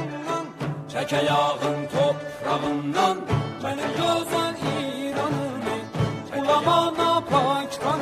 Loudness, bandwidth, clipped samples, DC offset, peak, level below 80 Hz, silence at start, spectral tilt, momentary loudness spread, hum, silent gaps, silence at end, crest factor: -24 LUFS; 15.5 kHz; under 0.1%; under 0.1%; -6 dBFS; -54 dBFS; 0 s; -5.5 dB/octave; 8 LU; none; none; 0 s; 18 dB